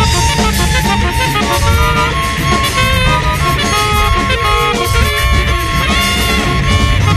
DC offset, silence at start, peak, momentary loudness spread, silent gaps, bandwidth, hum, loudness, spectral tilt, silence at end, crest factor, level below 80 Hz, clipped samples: under 0.1%; 0 s; 0 dBFS; 2 LU; none; 14 kHz; none; -12 LUFS; -4 dB/octave; 0 s; 12 dB; -18 dBFS; under 0.1%